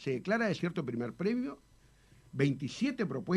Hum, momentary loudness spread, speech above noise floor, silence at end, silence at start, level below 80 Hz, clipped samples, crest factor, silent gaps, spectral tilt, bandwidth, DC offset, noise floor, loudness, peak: none; 8 LU; 29 dB; 0 s; 0 s; -68 dBFS; under 0.1%; 18 dB; none; -6.5 dB/octave; 11.5 kHz; under 0.1%; -62 dBFS; -34 LUFS; -16 dBFS